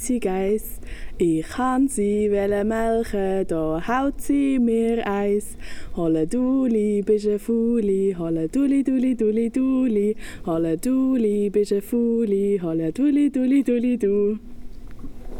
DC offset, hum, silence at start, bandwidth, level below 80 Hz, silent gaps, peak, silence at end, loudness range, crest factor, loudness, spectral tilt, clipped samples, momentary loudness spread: under 0.1%; none; 0 s; 16.5 kHz; -40 dBFS; none; -10 dBFS; 0 s; 2 LU; 12 dB; -22 LUFS; -6.5 dB/octave; under 0.1%; 6 LU